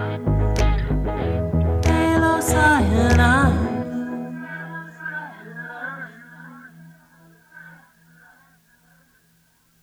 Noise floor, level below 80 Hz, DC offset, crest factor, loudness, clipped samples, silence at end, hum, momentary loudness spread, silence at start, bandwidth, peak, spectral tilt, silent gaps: -60 dBFS; -28 dBFS; under 0.1%; 18 dB; -20 LUFS; under 0.1%; 2.1 s; none; 20 LU; 0 s; 15 kHz; -4 dBFS; -6 dB/octave; none